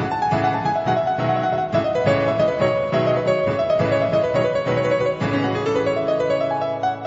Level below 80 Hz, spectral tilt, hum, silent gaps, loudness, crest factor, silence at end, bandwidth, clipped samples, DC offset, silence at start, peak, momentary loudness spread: -50 dBFS; -7 dB/octave; none; none; -20 LUFS; 14 dB; 0 s; 8 kHz; under 0.1%; under 0.1%; 0 s; -4 dBFS; 2 LU